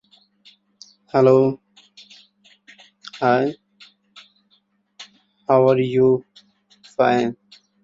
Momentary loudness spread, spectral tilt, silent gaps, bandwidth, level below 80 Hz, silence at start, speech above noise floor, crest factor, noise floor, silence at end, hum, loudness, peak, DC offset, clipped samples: 27 LU; -7.5 dB/octave; none; 7.6 kHz; -64 dBFS; 1.15 s; 48 dB; 20 dB; -64 dBFS; 0.5 s; none; -18 LUFS; -2 dBFS; under 0.1%; under 0.1%